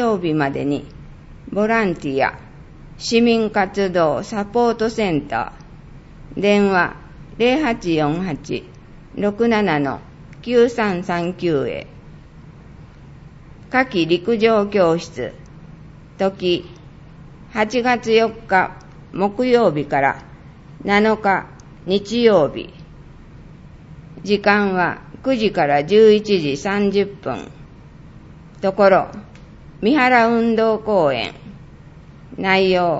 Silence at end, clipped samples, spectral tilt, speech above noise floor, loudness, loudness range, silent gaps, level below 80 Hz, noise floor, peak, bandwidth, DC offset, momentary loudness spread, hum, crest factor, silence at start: 0 s; under 0.1%; -6 dB/octave; 24 dB; -18 LUFS; 4 LU; none; -46 dBFS; -41 dBFS; 0 dBFS; 8 kHz; under 0.1%; 16 LU; none; 20 dB; 0 s